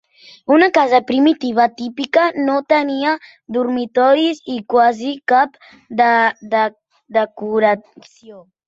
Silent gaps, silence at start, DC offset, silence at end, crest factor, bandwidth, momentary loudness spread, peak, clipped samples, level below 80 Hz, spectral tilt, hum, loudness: none; 0.5 s; under 0.1%; 0.25 s; 16 dB; 7.8 kHz; 9 LU; -2 dBFS; under 0.1%; -64 dBFS; -5 dB/octave; none; -16 LUFS